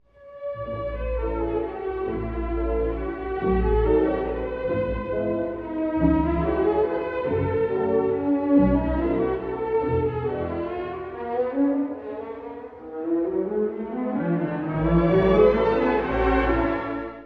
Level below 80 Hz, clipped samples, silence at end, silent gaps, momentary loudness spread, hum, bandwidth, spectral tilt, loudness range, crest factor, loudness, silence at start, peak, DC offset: -34 dBFS; under 0.1%; 0 s; none; 11 LU; none; 5.2 kHz; -10 dB/octave; 6 LU; 18 dB; -24 LUFS; 0.2 s; -6 dBFS; under 0.1%